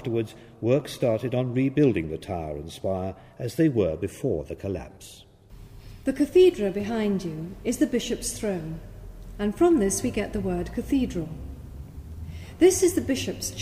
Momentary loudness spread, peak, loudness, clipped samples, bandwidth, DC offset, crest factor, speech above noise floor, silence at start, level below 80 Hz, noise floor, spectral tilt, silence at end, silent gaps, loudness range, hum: 19 LU; -6 dBFS; -26 LUFS; under 0.1%; 15.5 kHz; under 0.1%; 18 dB; 22 dB; 0 s; -44 dBFS; -47 dBFS; -5.5 dB/octave; 0 s; none; 4 LU; none